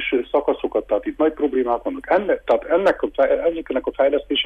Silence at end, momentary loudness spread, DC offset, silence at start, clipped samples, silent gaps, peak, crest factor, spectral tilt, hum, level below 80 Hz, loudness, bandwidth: 0 s; 5 LU; under 0.1%; 0 s; under 0.1%; none; -6 dBFS; 14 dB; -5.5 dB/octave; none; -48 dBFS; -20 LUFS; 7.2 kHz